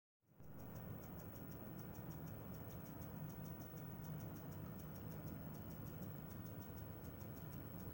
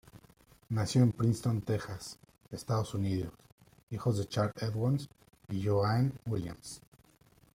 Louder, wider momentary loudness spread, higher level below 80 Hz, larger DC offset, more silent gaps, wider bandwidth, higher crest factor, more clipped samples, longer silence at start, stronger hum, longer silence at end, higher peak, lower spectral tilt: second, -52 LUFS vs -33 LUFS; second, 2 LU vs 18 LU; about the same, -66 dBFS vs -62 dBFS; neither; second, none vs 3.52-3.58 s, 3.83-3.87 s; about the same, 17 kHz vs 15.5 kHz; second, 14 dB vs 20 dB; neither; first, 0.3 s vs 0.15 s; neither; second, 0 s vs 0.8 s; second, -38 dBFS vs -14 dBFS; about the same, -7 dB/octave vs -7 dB/octave